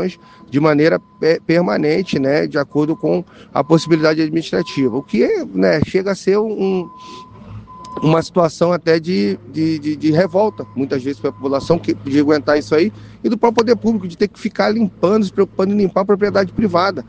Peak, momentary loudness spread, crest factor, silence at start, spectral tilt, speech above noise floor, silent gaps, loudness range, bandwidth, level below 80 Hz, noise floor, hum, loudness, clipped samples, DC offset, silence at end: 0 dBFS; 7 LU; 16 dB; 0 s; -7 dB/octave; 19 dB; none; 2 LU; 9 kHz; -50 dBFS; -35 dBFS; none; -16 LUFS; under 0.1%; under 0.1%; 0.05 s